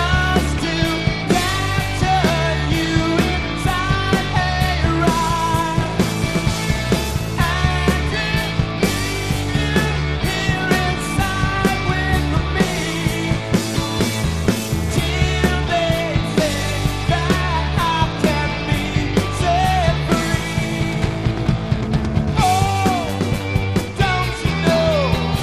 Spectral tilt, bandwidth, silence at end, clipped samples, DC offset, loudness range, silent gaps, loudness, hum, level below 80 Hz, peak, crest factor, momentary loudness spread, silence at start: -5 dB/octave; 14 kHz; 0 s; under 0.1%; 0.5%; 1 LU; none; -19 LUFS; none; -28 dBFS; -2 dBFS; 16 dB; 4 LU; 0 s